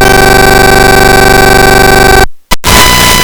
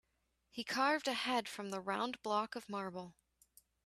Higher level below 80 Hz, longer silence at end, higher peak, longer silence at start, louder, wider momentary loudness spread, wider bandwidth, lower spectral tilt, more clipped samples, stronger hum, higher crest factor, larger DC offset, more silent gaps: first, -12 dBFS vs -80 dBFS; second, 0 s vs 0.75 s; first, 0 dBFS vs -20 dBFS; second, 0 s vs 0.55 s; first, -3 LUFS vs -38 LUFS; second, 3 LU vs 13 LU; first, over 20 kHz vs 14.5 kHz; about the same, -3 dB/octave vs -3.5 dB/octave; first, 10% vs under 0.1%; first, 50 Hz at -40 dBFS vs none; second, 4 dB vs 20 dB; first, 10% vs under 0.1%; neither